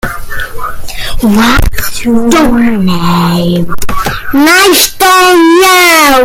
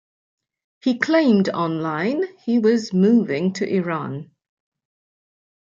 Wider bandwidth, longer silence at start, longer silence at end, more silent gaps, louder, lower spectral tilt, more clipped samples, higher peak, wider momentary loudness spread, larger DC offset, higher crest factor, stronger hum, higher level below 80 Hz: first, over 20 kHz vs 7.6 kHz; second, 0.05 s vs 0.85 s; second, 0 s vs 1.55 s; neither; first, -6 LUFS vs -20 LUFS; second, -3.5 dB/octave vs -7 dB/octave; first, 0.8% vs under 0.1%; about the same, 0 dBFS vs -2 dBFS; first, 15 LU vs 9 LU; neither; second, 6 dB vs 18 dB; neither; first, -20 dBFS vs -70 dBFS